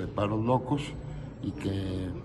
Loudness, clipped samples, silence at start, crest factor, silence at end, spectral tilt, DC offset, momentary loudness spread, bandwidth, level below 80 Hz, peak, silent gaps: -32 LUFS; under 0.1%; 0 s; 18 dB; 0 s; -7.5 dB/octave; under 0.1%; 11 LU; 12 kHz; -48 dBFS; -14 dBFS; none